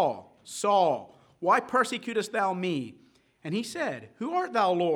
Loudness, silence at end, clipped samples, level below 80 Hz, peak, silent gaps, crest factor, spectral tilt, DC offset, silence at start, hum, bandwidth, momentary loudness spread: -28 LUFS; 0 s; under 0.1%; -78 dBFS; -10 dBFS; none; 18 dB; -4.5 dB/octave; under 0.1%; 0 s; none; 18.5 kHz; 12 LU